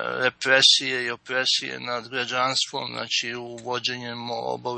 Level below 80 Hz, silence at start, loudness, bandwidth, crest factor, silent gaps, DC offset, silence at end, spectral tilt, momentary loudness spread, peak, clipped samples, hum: -72 dBFS; 0 s; -23 LUFS; 8.8 kHz; 20 dB; none; under 0.1%; 0 s; -1.5 dB/octave; 15 LU; -4 dBFS; under 0.1%; none